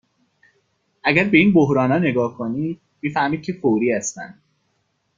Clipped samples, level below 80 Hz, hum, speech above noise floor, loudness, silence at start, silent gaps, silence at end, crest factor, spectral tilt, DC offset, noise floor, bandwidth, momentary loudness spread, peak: under 0.1%; -56 dBFS; none; 50 dB; -19 LUFS; 1.05 s; none; 0.85 s; 20 dB; -5.5 dB/octave; under 0.1%; -69 dBFS; 9.4 kHz; 14 LU; -2 dBFS